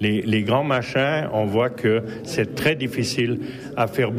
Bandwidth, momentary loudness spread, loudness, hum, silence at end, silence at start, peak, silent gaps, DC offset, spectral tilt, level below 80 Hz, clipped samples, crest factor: 15.5 kHz; 5 LU; -22 LUFS; none; 0 s; 0 s; -8 dBFS; none; under 0.1%; -5.5 dB/octave; -54 dBFS; under 0.1%; 14 dB